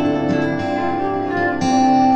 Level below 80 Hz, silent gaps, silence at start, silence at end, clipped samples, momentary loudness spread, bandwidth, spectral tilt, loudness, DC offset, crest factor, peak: -48 dBFS; none; 0 s; 0 s; under 0.1%; 6 LU; 8.6 kHz; -6 dB/octave; -18 LUFS; under 0.1%; 12 dB; -4 dBFS